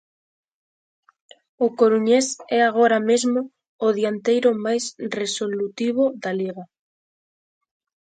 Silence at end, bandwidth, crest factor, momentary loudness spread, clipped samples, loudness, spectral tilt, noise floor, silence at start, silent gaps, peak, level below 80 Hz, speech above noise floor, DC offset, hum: 1.55 s; 9.4 kHz; 18 dB; 10 LU; under 0.1%; -21 LUFS; -4 dB/octave; under -90 dBFS; 1.6 s; 3.69-3.79 s; -6 dBFS; -74 dBFS; over 70 dB; under 0.1%; none